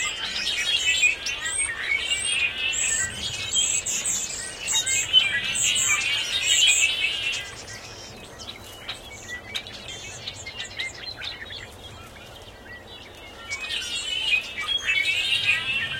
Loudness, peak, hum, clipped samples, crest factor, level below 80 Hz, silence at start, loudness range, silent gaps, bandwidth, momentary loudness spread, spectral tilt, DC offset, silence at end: -22 LUFS; -6 dBFS; none; under 0.1%; 20 dB; -52 dBFS; 0 s; 15 LU; none; 16.5 kHz; 22 LU; 1 dB/octave; under 0.1%; 0 s